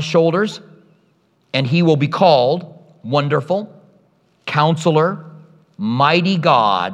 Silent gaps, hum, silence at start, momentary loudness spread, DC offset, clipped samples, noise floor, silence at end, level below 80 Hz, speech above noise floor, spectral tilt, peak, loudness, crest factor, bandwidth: none; none; 0 s; 12 LU; under 0.1%; under 0.1%; -59 dBFS; 0 s; -68 dBFS; 44 dB; -6.5 dB/octave; 0 dBFS; -16 LUFS; 16 dB; 9.4 kHz